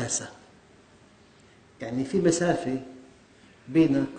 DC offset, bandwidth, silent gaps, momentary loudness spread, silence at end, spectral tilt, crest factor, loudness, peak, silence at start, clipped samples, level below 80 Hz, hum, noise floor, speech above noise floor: under 0.1%; 9.4 kHz; none; 18 LU; 0 s; -5 dB/octave; 20 dB; -26 LUFS; -10 dBFS; 0 s; under 0.1%; -60 dBFS; none; -56 dBFS; 31 dB